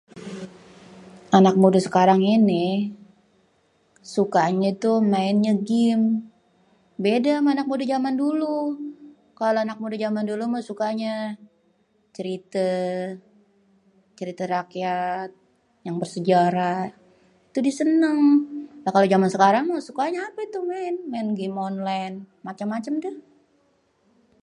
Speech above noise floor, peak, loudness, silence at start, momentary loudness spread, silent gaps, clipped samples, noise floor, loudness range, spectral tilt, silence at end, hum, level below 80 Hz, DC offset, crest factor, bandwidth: 43 dB; -2 dBFS; -22 LUFS; 0.15 s; 17 LU; none; under 0.1%; -65 dBFS; 9 LU; -6.5 dB/octave; 1.25 s; none; -70 dBFS; under 0.1%; 20 dB; 11 kHz